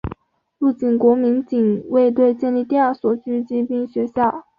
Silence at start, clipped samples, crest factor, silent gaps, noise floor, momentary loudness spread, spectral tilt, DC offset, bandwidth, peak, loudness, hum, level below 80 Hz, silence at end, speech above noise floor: 0.05 s; under 0.1%; 14 dB; none; -41 dBFS; 7 LU; -9.5 dB/octave; under 0.1%; 5 kHz; -4 dBFS; -18 LUFS; none; -48 dBFS; 0.2 s; 24 dB